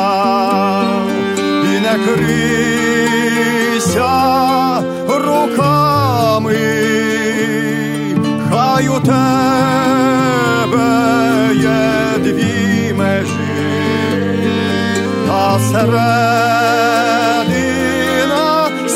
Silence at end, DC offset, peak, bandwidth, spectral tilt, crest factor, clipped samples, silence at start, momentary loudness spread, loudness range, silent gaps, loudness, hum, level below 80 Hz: 0 s; under 0.1%; -2 dBFS; 16 kHz; -5 dB/octave; 12 dB; under 0.1%; 0 s; 4 LU; 2 LU; none; -13 LUFS; none; -44 dBFS